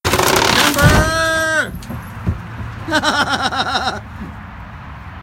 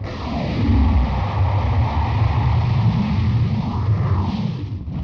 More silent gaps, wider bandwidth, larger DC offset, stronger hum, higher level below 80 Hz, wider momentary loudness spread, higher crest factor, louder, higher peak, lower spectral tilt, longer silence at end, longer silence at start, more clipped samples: neither; first, 17 kHz vs 6.4 kHz; neither; neither; about the same, -30 dBFS vs -26 dBFS; first, 21 LU vs 7 LU; first, 18 dB vs 12 dB; first, -15 LUFS vs -20 LUFS; first, 0 dBFS vs -8 dBFS; second, -3.5 dB/octave vs -9 dB/octave; about the same, 0 s vs 0 s; about the same, 0.05 s vs 0 s; neither